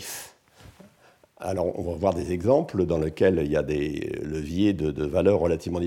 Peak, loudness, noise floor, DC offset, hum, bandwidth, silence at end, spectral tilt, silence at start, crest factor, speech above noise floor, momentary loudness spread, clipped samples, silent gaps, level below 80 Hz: -8 dBFS; -25 LUFS; -58 dBFS; under 0.1%; none; 18 kHz; 0 s; -7 dB/octave; 0 s; 18 dB; 34 dB; 10 LU; under 0.1%; none; -44 dBFS